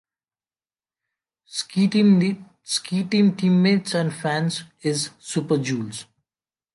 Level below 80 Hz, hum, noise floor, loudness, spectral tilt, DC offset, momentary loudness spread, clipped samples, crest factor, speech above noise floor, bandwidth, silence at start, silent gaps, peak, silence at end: -68 dBFS; none; under -90 dBFS; -22 LUFS; -5.5 dB/octave; under 0.1%; 12 LU; under 0.1%; 16 dB; over 69 dB; 11.5 kHz; 1.5 s; none; -8 dBFS; 0.7 s